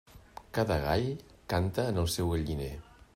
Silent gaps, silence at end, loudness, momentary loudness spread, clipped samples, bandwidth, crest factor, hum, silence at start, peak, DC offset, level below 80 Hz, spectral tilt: none; 0.35 s; -32 LUFS; 15 LU; under 0.1%; 16 kHz; 18 dB; none; 0.15 s; -14 dBFS; under 0.1%; -48 dBFS; -5.5 dB/octave